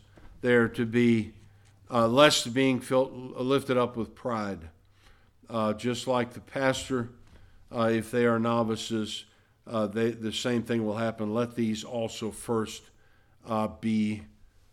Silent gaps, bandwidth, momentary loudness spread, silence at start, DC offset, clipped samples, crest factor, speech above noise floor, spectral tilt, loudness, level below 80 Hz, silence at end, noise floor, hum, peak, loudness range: none; 14.5 kHz; 11 LU; 0.25 s; under 0.1%; under 0.1%; 22 dB; 32 dB; -5 dB/octave; -28 LUFS; -58 dBFS; 0.45 s; -60 dBFS; none; -6 dBFS; 6 LU